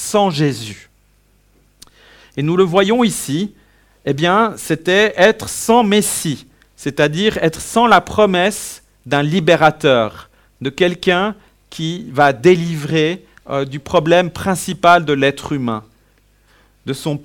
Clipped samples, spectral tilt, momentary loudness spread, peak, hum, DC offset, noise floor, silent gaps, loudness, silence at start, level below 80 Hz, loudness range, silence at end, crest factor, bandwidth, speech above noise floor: 0.1%; -4.5 dB/octave; 15 LU; 0 dBFS; none; under 0.1%; -55 dBFS; none; -15 LUFS; 0 s; -48 dBFS; 3 LU; 0.05 s; 16 dB; 19 kHz; 40 dB